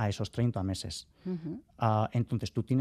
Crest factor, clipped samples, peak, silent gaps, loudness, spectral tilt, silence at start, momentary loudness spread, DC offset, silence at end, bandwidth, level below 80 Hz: 20 dB; under 0.1%; -12 dBFS; none; -33 LUFS; -6.5 dB/octave; 0 s; 11 LU; under 0.1%; 0 s; 13.5 kHz; -60 dBFS